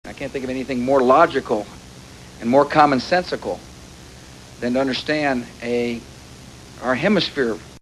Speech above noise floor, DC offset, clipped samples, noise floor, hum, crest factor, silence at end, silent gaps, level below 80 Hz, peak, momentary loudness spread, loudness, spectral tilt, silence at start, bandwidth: 22 dB; under 0.1%; under 0.1%; -41 dBFS; none; 20 dB; 0.05 s; none; -48 dBFS; 0 dBFS; 25 LU; -20 LUFS; -5.5 dB/octave; 0.05 s; 12 kHz